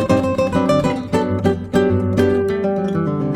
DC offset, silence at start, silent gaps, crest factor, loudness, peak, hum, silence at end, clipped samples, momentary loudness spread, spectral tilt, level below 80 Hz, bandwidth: under 0.1%; 0 s; none; 14 dB; -18 LUFS; -2 dBFS; none; 0 s; under 0.1%; 3 LU; -7.5 dB/octave; -42 dBFS; 15 kHz